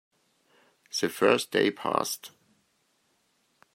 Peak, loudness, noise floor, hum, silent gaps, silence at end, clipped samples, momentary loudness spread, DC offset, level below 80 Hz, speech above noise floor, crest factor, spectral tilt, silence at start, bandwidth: -6 dBFS; -27 LUFS; -71 dBFS; none; none; 1.45 s; under 0.1%; 12 LU; under 0.1%; -78 dBFS; 45 dB; 24 dB; -3 dB/octave; 0.95 s; 16 kHz